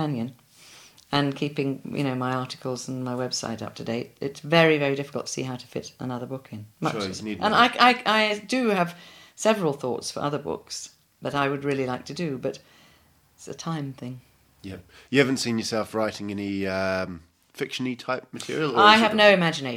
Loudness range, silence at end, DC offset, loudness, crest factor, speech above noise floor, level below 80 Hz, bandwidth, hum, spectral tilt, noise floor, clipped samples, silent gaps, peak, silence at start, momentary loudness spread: 8 LU; 0 s; under 0.1%; -24 LUFS; 24 dB; 35 dB; -64 dBFS; 17.5 kHz; none; -4.5 dB/octave; -59 dBFS; under 0.1%; none; 0 dBFS; 0 s; 18 LU